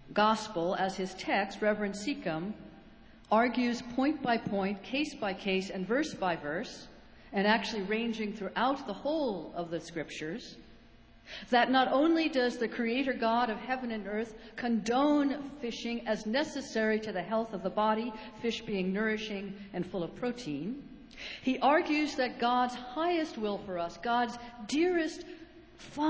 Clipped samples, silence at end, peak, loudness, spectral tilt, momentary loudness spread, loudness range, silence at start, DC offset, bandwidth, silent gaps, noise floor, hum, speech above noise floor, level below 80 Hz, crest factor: under 0.1%; 0 s; -12 dBFS; -32 LUFS; -5 dB/octave; 12 LU; 4 LU; 0 s; under 0.1%; 8 kHz; none; -57 dBFS; none; 25 dB; -62 dBFS; 20 dB